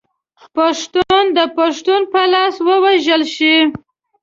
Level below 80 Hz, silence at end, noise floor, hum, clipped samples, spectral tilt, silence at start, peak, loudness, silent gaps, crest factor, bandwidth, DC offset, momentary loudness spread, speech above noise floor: -54 dBFS; 0.45 s; -50 dBFS; none; under 0.1%; -3 dB/octave; 0.55 s; -2 dBFS; -13 LUFS; none; 14 dB; 7.6 kHz; under 0.1%; 6 LU; 36 dB